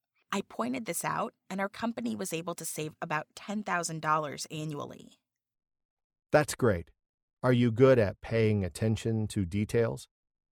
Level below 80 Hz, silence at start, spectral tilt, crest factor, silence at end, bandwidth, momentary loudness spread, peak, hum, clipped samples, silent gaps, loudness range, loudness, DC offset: -58 dBFS; 0.3 s; -5.5 dB/octave; 22 dB; 0.5 s; 19.5 kHz; 11 LU; -10 dBFS; none; under 0.1%; 5.85-5.97 s, 6.04-6.10 s, 7.09-7.37 s; 7 LU; -31 LUFS; under 0.1%